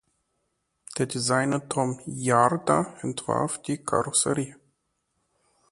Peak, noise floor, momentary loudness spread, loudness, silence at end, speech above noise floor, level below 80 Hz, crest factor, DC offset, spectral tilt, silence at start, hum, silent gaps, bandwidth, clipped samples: -4 dBFS; -76 dBFS; 9 LU; -25 LUFS; 1.15 s; 51 dB; -62 dBFS; 22 dB; under 0.1%; -4 dB/octave; 0.9 s; none; none; 11.5 kHz; under 0.1%